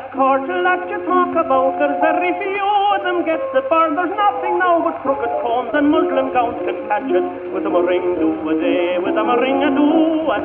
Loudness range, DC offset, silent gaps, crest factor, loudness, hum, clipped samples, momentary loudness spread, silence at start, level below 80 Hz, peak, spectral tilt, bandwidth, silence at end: 2 LU; under 0.1%; none; 12 dB; -17 LUFS; none; under 0.1%; 4 LU; 0 s; -56 dBFS; -4 dBFS; -9 dB/octave; 4 kHz; 0 s